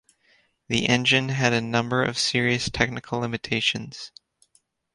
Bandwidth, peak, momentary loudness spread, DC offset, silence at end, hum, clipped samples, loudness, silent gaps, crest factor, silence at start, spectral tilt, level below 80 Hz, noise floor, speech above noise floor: 11.5 kHz; -4 dBFS; 10 LU; under 0.1%; 0.85 s; none; under 0.1%; -23 LUFS; none; 22 dB; 0.7 s; -4 dB/octave; -52 dBFS; -66 dBFS; 42 dB